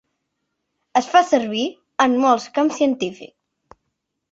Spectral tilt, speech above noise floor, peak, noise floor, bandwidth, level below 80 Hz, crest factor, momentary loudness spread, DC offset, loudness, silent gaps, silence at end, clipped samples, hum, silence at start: -3.5 dB/octave; 58 dB; -2 dBFS; -76 dBFS; 8 kHz; -66 dBFS; 18 dB; 10 LU; under 0.1%; -19 LUFS; none; 1.05 s; under 0.1%; none; 0.95 s